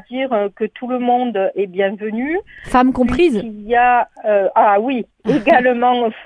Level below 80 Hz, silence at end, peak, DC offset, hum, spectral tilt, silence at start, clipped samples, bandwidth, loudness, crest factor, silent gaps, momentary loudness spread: -42 dBFS; 0 s; 0 dBFS; under 0.1%; none; -6.5 dB/octave; 0.1 s; under 0.1%; 11 kHz; -16 LUFS; 16 dB; none; 9 LU